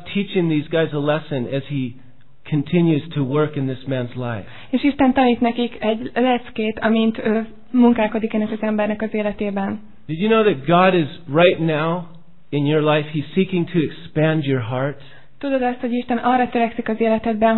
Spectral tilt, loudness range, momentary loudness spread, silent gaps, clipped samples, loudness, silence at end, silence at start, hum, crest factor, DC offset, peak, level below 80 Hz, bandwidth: -10.5 dB/octave; 3 LU; 10 LU; none; under 0.1%; -20 LUFS; 0 s; 0 s; none; 18 dB; 1%; -2 dBFS; -50 dBFS; 4.3 kHz